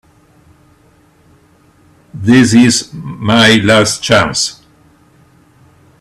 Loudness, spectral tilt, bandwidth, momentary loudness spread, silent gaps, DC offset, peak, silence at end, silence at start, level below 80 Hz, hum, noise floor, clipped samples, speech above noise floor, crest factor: -10 LUFS; -4 dB/octave; 13.5 kHz; 12 LU; none; under 0.1%; 0 dBFS; 1.5 s; 2.15 s; -46 dBFS; none; -48 dBFS; under 0.1%; 39 dB; 14 dB